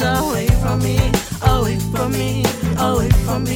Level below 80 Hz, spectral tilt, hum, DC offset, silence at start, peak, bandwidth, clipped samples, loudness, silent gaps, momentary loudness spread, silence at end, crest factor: -24 dBFS; -5.5 dB/octave; none; under 0.1%; 0 s; -2 dBFS; 17.5 kHz; under 0.1%; -18 LUFS; none; 3 LU; 0 s; 14 dB